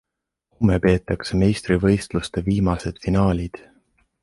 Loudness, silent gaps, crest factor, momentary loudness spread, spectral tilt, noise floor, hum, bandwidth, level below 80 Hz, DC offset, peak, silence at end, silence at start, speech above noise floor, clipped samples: -21 LUFS; none; 18 dB; 7 LU; -7 dB/octave; -72 dBFS; none; 11.5 kHz; -36 dBFS; under 0.1%; -4 dBFS; 0.65 s; 0.6 s; 52 dB; under 0.1%